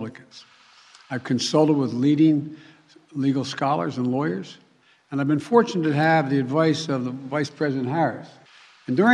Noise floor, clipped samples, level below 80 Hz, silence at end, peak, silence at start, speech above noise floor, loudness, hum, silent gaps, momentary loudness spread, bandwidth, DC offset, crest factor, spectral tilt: -52 dBFS; under 0.1%; -72 dBFS; 0 s; -2 dBFS; 0 s; 30 dB; -22 LUFS; none; none; 14 LU; 10.5 kHz; under 0.1%; 20 dB; -6 dB/octave